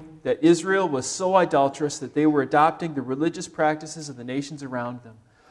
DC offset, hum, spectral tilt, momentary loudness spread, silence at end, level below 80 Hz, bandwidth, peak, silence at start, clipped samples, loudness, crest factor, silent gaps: under 0.1%; none; -5 dB/octave; 12 LU; 0.35 s; -64 dBFS; 11.5 kHz; -4 dBFS; 0 s; under 0.1%; -23 LUFS; 18 dB; none